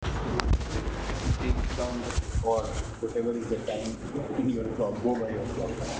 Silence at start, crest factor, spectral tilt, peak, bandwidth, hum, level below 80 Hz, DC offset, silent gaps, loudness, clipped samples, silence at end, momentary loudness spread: 0 s; 24 dB; -6 dB/octave; -6 dBFS; 8 kHz; none; -34 dBFS; under 0.1%; none; -31 LUFS; under 0.1%; 0 s; 5 LU